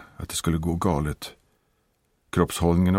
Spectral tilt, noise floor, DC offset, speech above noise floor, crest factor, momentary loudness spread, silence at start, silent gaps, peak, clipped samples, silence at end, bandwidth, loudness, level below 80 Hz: -6 dB/octave; -69 dBFS; under 0.1%; 46 dB; 20 dB; 10 LU; 0 s; none; -6 dBFS; under 0.1%; 0 s; 16.5 kHz; -26 LUFS; -40 dBFS